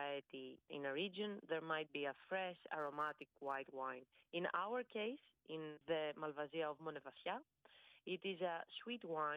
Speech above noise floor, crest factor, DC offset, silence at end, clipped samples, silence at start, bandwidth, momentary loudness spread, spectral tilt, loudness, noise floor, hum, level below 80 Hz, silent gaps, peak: 23 dB; 18 dB; under 0.1%; 0 s; under 0.1%; 0 s; 5.4 kHz; 8 LU; -6.5 dB/octave; -46 LUFS; -69 dBFS; none; under -90 dBFS; none; -28 dBFS